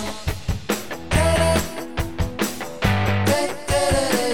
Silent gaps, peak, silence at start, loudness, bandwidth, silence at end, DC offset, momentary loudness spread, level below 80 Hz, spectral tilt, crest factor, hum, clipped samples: none; -4 dBFS; 0 s; -22 LUFS; 19.5 kHz; 0 s; 2%; 9 LU; -32 dBFS; -4.5 dB/octave; 18 dB; none; under 0.1%